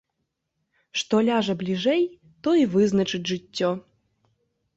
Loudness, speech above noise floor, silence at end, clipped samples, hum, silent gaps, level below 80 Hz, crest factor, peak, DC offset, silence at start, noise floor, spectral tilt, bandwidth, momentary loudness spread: -24 LUFS; 56 dB; 0.95 s; under 0.1%; none; none; -64 dBFS; 16 dB; -8 dBFS; under 0.1%; 0.95 s; -79 dBFS; -5.5 dB/octave; 8 kHz; 9 LU